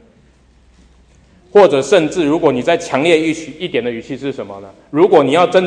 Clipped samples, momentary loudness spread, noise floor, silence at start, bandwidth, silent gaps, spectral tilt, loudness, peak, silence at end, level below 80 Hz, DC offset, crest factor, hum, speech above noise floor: under 0.1%; 14 LU; -49 dBFS; 1.55 s; 10 kHz; none; -5 dB/octave; -14 LUFS; 0 dBFS; 0 s; -52 dBFS; under 0.1%; 14 dB; none; 36 dB